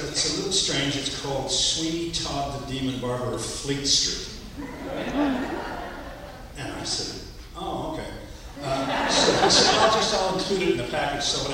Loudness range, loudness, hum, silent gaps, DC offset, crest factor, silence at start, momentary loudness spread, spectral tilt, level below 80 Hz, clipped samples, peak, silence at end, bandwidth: 9 LU; -24 LUFS; none; none; under 0.1%; 20 dB; 0 s; 18 LU; -2.5 dB/octave; -44 dBFS; under 0.1%; -4 dBFS; 0 s; 16 kHz